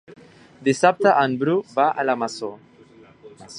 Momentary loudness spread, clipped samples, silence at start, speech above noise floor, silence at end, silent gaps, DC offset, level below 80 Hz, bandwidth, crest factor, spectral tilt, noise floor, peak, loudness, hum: 11 LU; under 0.1%; 0.1 s; 30 dB; 0 s; none; under 0.1%; -70 dBFS; 11 kHz; 20 dB; -5 dB/octave; -49 dBFS; -2 dBFS; -20 LUFS; none